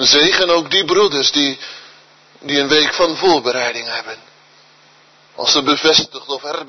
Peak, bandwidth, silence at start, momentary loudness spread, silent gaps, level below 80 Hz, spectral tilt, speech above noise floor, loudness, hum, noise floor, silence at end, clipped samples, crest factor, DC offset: 0 dBFS; 6.4 kHz; 0 s; 14 LU; none; -54 dBFS; -2 dB/octave; 34 dB; -14 LUFS; none; -49 dBFS; 0 s; under 0.1%; 16 dB; under 0.1%